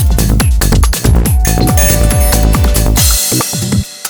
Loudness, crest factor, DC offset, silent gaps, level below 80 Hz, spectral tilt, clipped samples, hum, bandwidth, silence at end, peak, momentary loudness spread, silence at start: -10 LUFS; 10 dB; under 0.1%; none; -12 dBFS; -4 dB/octave; 0.3%; none; over 20 kHz; 0 s; 0 dBFS; 3 LU; 0 s